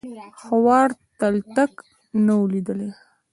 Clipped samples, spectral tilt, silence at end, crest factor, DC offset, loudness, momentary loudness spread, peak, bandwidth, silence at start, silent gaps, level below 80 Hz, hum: under 0.1%; -7.5 dB/octave; 0.4 s; 16 dB; under 0.1%; -21 LUFS; 14 LU; -4 dBFS; 11.5 kHz; 0.05 s; none; -62 dBFS; none